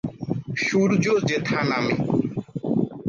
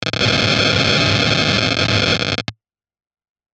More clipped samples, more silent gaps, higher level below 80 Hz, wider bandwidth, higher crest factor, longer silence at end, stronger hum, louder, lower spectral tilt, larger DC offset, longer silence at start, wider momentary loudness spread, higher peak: neither; neither; second, -56 dBFS vs -42 dBFS; second, 7.4 kHz vs 9.4 kHz; about the same, 14 dB vs 18 dB; second, 0 s vs 1 s; neither; second, -23 LUFS vs -15 LUFS; first, -6 dB/octave vs -4 dB/octave; neither; about the same, 0.05 s vs 0 s; first, 10 LU vs 6 LU; second, -8 dBFS vs 0 dBFS